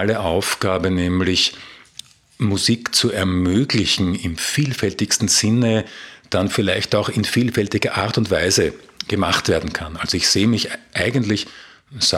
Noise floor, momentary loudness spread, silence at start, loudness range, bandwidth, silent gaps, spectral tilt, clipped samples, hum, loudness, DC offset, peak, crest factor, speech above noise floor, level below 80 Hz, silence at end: -43 dBFS; 9 LU; 0 s; 2 LU; 16.5 kHz; none; -4 dB/octave; under 0.1%; none; -19 LUFS; under 0.1%; -4 dBFS; 16 dB; 24 dB; -44 dBFS; 0 s